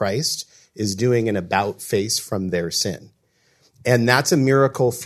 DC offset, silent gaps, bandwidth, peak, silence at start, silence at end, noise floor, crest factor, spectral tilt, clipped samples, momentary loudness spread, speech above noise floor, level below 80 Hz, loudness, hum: under 0.1%; none; 14 kHz; 0 dBFS; 0 s; 0 s; -62 dBFS; 20 dB; -4.5 dB/octave; under 0.1%; 11 LU; 42 dB; -62 dBFS; -20 LUFS; none